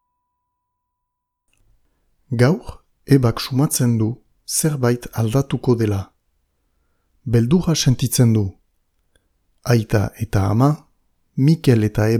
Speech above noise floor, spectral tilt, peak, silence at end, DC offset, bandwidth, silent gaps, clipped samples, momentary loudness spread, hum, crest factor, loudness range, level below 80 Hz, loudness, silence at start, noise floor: 62 dB; -6 dB/octave; 0 dBFS; 0 s; under 0.1%; 16 kHz; none; under 0.1%; 11 LU; none; 20 dB; 3 LU; -42 dBFS; -18 LUFS; 2.3 s; -78 dBFS